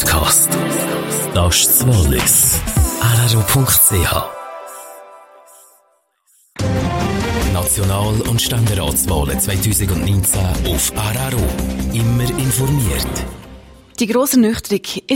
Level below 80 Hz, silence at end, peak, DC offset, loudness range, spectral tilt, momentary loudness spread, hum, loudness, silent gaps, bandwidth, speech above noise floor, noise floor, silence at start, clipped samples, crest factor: -26 dBFS; 0 s; 0 dBFS; under 0.1%; 8 LU; -4 dB/octave; 12 LU; none; -15 LUFS; none; 16.5 kHz; 44 dB; -59 dBFS; 0 s; under 0.1%; 16 dB